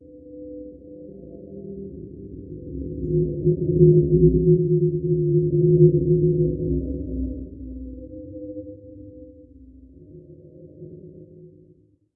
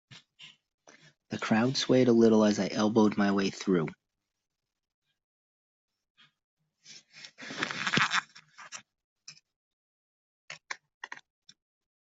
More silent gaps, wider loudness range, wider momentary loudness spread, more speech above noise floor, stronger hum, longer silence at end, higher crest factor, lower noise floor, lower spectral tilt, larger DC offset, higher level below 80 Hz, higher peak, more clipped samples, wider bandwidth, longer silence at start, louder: second, none vs 0.74-0.78 s, 4.94-5.02 s, 5.24-5.88 s, 6.10-6.15 s, 6.44-6.57 s, 9.04-9.16 s, 9.56-10.48 s, 10.94-11.01 s; about the same, 22 LU vs 21 LU; about the same, 26 LU vs 25 LU; first, 39 dB vs 30 dB; neither; second, 0.7 s vs 1.05 s; second, 20 dB vs 26 dB; about the same, -57 dBFS vs -56 dBFS; first, -18.5 dB/octave vs -5 dB/octave; neither; first, -38 dBFS vs -72 dBFS; first, -2 dBFS vs -6 dBFS; neither; second, 0.7 kHz vs 8 kHz; about the same, 0.15 s vs 0.1 s; first, -20 LUFS vs -27 LUFS